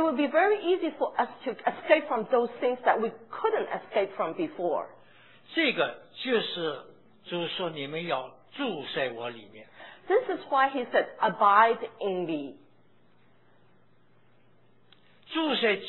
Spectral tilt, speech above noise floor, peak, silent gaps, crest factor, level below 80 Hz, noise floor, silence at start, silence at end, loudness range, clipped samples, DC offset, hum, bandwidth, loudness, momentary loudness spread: -7.5 dB/octave; 37 dB; -8 dBFS; none; 22 dB; -78 dBFS; -65 dBFS; 0 s; 0 s; 8 LU; under 0.1%; 0.1%; none; 4.3 kHz; -28 LUFS; 11 LU